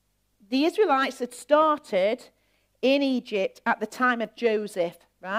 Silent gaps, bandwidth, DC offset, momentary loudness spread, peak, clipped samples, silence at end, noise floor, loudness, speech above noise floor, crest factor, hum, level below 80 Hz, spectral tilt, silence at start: none; 16 kHz; under 0.1%; 9 LU; -8 dBFS; under 0.1%; 0 s; -63 dBFS; -25 LUFS; 38 dB; 18 dB; none; -74 dBFS; -4 dB/octave; 0.5 s